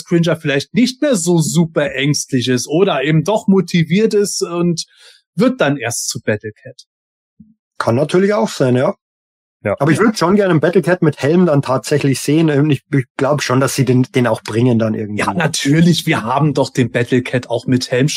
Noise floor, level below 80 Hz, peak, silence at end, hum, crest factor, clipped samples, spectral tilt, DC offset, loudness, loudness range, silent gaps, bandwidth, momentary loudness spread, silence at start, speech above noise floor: under -90 dBFS; -54 dBFS; 0 dBFS; 0 s; none; 14 dB; under 0.1%; -5.5 dB/octave; under 0.1%; -15 LUFS; 4 LU; 5.26-5.33 s, 6.87-7.37 s, 7.59-7.71 s, 9.01-9.60 s, 13.10-13.15 s; 16 kHz; 6 LU; 0.1 s; over 76 dB